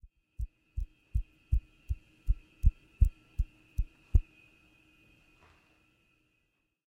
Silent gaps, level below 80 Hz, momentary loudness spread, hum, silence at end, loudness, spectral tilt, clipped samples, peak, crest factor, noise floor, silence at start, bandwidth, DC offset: none; -34 dBFS; 13 LU; none; 2.65 s; -36 LUFS; -8 dB/octave; under 0.1%; -12 dBFS; 22 dB; -78 dBFS; 0.4 s; 3.4 kHz; under 0.1%